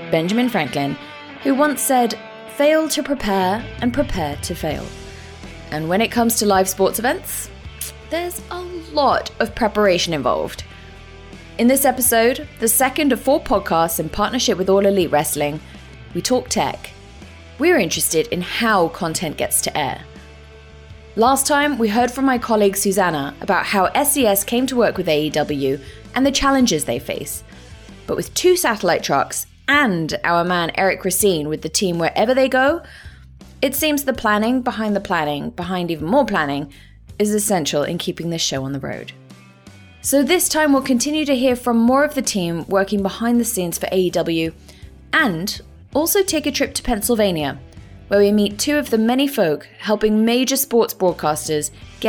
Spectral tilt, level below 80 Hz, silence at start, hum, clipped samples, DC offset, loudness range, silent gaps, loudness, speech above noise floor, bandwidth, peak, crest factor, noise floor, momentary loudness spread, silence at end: -3.5 dB/octave; -42 dBFS; 0 s; none; under 0.1%; under 0.1%; 4 LU; none; -18 LUFS; 25 dB; 19 kHz; -4 dBFS; 14 dB; -43 dBFS; 11 LU; 0 s